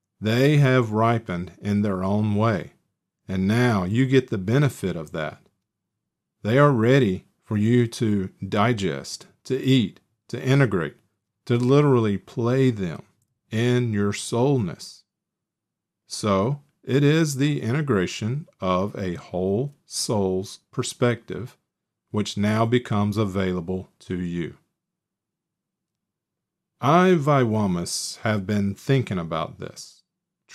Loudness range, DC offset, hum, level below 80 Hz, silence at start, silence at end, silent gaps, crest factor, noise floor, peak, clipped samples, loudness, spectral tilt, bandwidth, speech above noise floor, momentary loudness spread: 4 LU; under 0.1%; none; -60 dBFS; 0.2 s; 0 s; none; 18 dB; -85 dBFS; -6 dBFS; under 0.1%; -23 LUFS; -6.5 dB/octave; 14 kHz; 63 dB; 14 LU